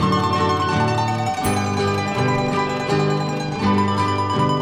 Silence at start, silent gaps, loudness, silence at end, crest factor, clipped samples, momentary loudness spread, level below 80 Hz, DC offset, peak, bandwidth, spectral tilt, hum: 0 s; none; -20 LUFS; 0 s; 14 dB; under 0.1%; 3 LU; -46 dBFS; under 0.1%; -6 dBFS; 15.5 kHz; -6 dB/octave; none